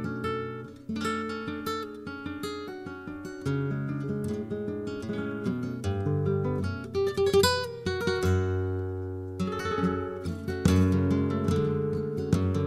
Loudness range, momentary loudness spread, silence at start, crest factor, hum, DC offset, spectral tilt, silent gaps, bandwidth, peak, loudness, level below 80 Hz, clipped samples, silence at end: 6 LU; 12 LU; 0 s; 20 dB; none; under 0.1%; -6.5 dB/octave; none; 15.5 kHz; -10 dBFS; -30 LUFS; -50 dBFS; under 0.1%; 0 s